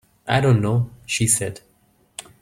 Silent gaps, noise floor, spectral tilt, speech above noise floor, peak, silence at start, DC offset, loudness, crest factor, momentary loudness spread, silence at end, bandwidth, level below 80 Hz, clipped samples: none; -60 dBFS; -4.5 dB/octave; 41 dB; -2 dBFS; 0.25 s; under 0.1%; -20 LUFS; 20 dB; 21 LU; 0.2 s; 16 kHz; -50 dBFS; under 0.1%